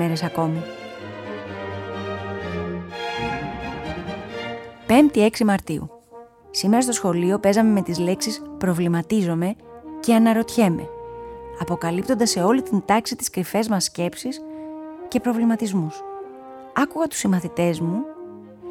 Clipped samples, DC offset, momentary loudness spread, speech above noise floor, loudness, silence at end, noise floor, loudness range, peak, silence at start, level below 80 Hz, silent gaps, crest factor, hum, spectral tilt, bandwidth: under 0.1%; under 0.1%; 17 LU; 25 dB; -22 LUFS; 0 s; -45 dBFS; 8 LU; -2 dBFS; 0 s; -52 dBFS; none; 20 dB; none; -5 dB/octave; 16.5 kHz